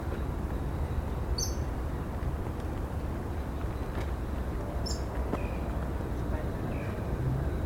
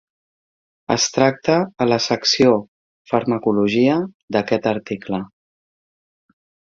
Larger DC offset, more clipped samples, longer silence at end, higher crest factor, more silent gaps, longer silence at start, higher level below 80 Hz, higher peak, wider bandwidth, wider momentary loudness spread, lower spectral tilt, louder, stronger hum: neither; neither; second, 0 s vs 1.5 s; about the same, 14 dB vs 18 dB; second, none vs 2.68-3.05 s, 4.14-4.28 s; second, 0 s vs 0.9 s; first, -36 dBFS vs -58 dBFS; second, -18 dBFS vs -2 dBFS; first, 16.5 kHz vs 7.6 kHz; second, 4 LU vs 10 LU; first, -6 dB/octave vs -4.5 dB/octave; second, -34 LUFS vs -19 LUFS; neither